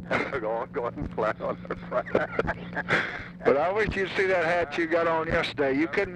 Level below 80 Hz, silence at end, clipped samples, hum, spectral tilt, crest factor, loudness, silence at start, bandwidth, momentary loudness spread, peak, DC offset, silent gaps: -48 dBFS; 0 s; under 0.1%; none; -6 dB/octave; 18 dB; -27 LUFS; 0 s; 10.5 kHz; 8 LU; -8 dBFS; under 0.1%; none